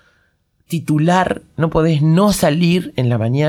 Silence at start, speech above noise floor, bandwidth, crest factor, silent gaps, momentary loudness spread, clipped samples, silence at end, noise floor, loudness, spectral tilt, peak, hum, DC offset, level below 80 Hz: 0.7 s; 46 dB; 15 kHz; 16 dB; none; 7 LU; under 0.1%; 0 s; -61 dBFS; -16 LUFS; -6.5 dB/octave; 0 dBFS; none; under 0.1%; -40 dBFS